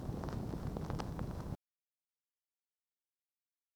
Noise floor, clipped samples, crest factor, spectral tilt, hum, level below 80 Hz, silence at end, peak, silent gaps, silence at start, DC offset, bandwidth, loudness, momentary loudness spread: under -90 dBFS; under 0.1%; 22 dB; -7.5 dB/octave; none; -52 dBFS; 2.2 s; -24 dBFS; none; 0 s; under 0.1%; over 20 kHz; -43 LUFS; 5 LU